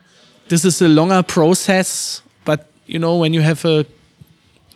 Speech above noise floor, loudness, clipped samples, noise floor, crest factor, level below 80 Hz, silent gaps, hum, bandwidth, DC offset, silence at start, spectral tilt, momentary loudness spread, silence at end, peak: 37 dB; -15 LUFS; under 0.1%; -52 dBFS; 16 dB; -60 dBFS; none; none; 14.5 kHz; under 0.1%; 0.5 s; -5 dB/octave; 11 LU; 0.9 s; 0 dBFS